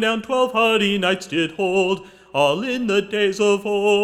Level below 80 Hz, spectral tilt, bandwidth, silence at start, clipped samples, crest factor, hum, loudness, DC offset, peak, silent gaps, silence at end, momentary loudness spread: -60 dBFS; -4.5 dB/octave; 14 kHz; 0 s; under 0.1%; 14 dB; none; -20 LUFS; under 0.1%; -4 dBFS; none; 0 s; 6 LU